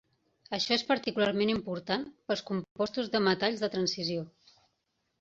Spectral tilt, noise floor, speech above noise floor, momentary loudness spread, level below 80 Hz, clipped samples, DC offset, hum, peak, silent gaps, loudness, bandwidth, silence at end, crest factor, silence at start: -4.5 dB/octave; -79 dBFS; 49 dB; 7 LU; -66 dBFS; under 0.1%; under 0.1%; none; -12 dBFS; 2.71-2.75 s; -31 LUFS; 7.8 kHz; 0.9 s; 20 dB; 0.5 s